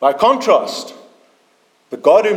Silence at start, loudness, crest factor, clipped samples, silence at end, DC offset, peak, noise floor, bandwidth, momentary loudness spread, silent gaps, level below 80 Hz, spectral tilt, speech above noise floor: 0 s; -14 LUFS; 16 dB; under 0.1%; 0 s; under 0.1%; 0 dBFS; -57 dBFS; 14 kHz; 19 LU; none; -62 dBFS; -3.5 dB/octave; 43 dB